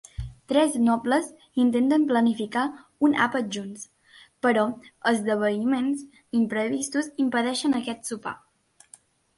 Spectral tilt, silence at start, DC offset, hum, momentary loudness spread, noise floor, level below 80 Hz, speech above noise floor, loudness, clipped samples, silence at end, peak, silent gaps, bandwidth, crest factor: -4.5 dB/octave; 0.2 s; under 0.1%; none; 12 LU; -55 dBFS; -52 dBFS; 31 dB; -25 LUFS; under 0.1%; 1 s; -8 dBFS; none; 11.5 kHz; 18 dB